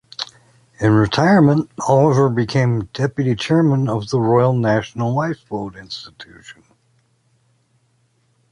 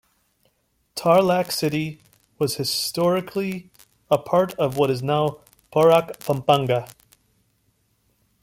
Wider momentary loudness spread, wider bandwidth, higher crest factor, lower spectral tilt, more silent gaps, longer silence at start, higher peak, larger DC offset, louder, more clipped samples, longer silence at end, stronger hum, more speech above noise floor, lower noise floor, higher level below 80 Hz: first, 17 LU vs 10 LU; second, 11 kHz vs 16.5 kHz; about the same, 16 dB vs 20 dB; first, -7 dB/octave vs -5 dB/octave; neither; second, 0.2 s vs 0.95 s; about the same, -2 dBFS vs -2 dBFS; neither; first, -17 LUFS vs -21 LUFS; neither; first, 2 s vs 1.6 s; neither; about the same, 45 dB vs 47 dB; second, -62 dBFS vs -68 dBFS; first, -50 dBFS vs -60 dBFS